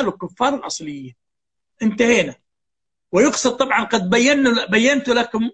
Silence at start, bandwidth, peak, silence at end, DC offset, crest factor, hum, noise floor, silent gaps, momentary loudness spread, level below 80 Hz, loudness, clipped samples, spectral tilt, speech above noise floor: 0 s; 8.8 kHz; -2 dBFS; 0.05 s; under 0.1%; 18 dB; none; -86 dBFS; none; 11 LU; -54 dBFS; -18 LUFS; under 0.1%; -3.5 dB/octave; 68 dB